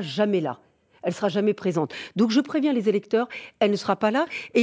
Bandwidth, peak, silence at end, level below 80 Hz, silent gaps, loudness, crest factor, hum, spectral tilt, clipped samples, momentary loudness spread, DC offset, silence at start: 8 kHz; -8 dBFS; 0 s; -70 dBFS; none; -24 LUFS; 16 dB; none; -6 dB/octave; under 0.1%; 9 LU; under 0.1%; 0 s